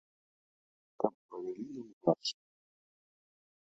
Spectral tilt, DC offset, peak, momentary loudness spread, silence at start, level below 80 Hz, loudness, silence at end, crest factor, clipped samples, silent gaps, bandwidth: -5.5 dB/octave; under 0.1%; -12 dBFS; 13 LU; 1 s; -82 dBFS; -37 LUFS; 1.3 s; 28 dB; under 0.1%; 1.14-1.29 s, 1.93-2.01 s; 7.4 kHz